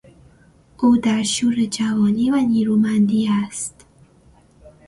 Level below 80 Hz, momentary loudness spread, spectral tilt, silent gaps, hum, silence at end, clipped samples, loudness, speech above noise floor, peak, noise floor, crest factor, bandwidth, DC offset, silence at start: -54 dBFS; 5 LU; -5 dB/octave; none; none; 0.2 s; under 0.1%; -18 LUFS; 35 dB; -6 dBFS; -52 dBFS; 14 dB; 11.5 kHz; under 0.1%; 0.8 s